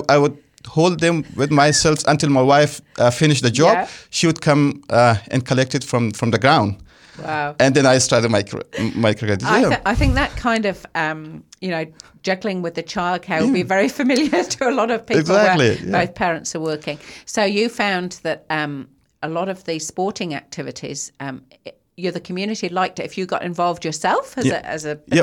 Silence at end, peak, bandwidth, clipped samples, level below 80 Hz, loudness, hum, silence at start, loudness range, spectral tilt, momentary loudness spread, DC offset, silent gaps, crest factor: 0 s; -2 dBFS; 17 kHz; under 0.1%; -38 dBFS; -19 LUFS; none; 0 s; 10 LU; -4.5 dB/octave; 13 LU; under 0.1%; none; 18 dB